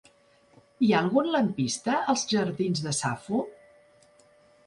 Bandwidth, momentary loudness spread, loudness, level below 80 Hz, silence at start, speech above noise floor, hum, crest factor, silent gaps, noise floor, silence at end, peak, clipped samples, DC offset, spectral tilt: 11.5 kHz; 7 LU; -26 LUFS; -68 dBFS; 0.8 s; 35 dB; none; 18 dB; none; -61 dBFS; 1.15 s; -10 dBFS; under 0.1%; under 0.1%; -4.5 dB/octave